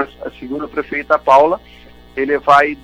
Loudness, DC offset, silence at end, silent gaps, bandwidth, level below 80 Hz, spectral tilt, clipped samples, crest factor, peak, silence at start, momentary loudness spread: -15 LUFS; under 0.1%; 0.1 s; none; 11 kHz; -46 dBFS; -5 dB/octave; under 0.1%; 14 dB; 0 dBFS; 0 s; 15 LU